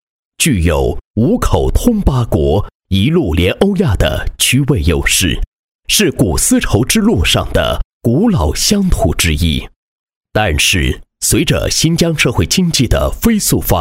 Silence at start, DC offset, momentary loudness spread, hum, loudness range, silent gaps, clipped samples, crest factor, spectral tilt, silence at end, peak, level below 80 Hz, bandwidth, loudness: 0.4 s; under 0.1%; 5 LU; none; 2 LU; 1.05-1.14 s, 2.75-2.80 s, 5.47-5.79 s, 7.85-8.00 s, 9.76-10.07 s, 10.16-10.21 s; under 0.1%; 12 dB; -4.5 dB/octave; 0 s; 0 dBFS; -22 dBFS; 16.5 kHz; -13 LUFS